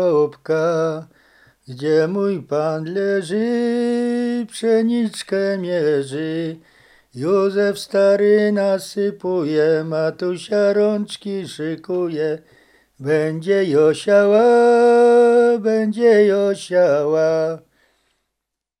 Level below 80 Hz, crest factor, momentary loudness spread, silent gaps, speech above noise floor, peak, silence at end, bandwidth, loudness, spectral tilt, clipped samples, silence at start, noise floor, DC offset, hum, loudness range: -66 dBFS; 14 dB; 12 LU; none; 64 dB; -4 dBFS; 1.2 s; 12.5 kHz; -18 LUFS; -6 dB/octave; under 0.1%; 0 s; -81 dBFS; under 0.1%; none; 7 LU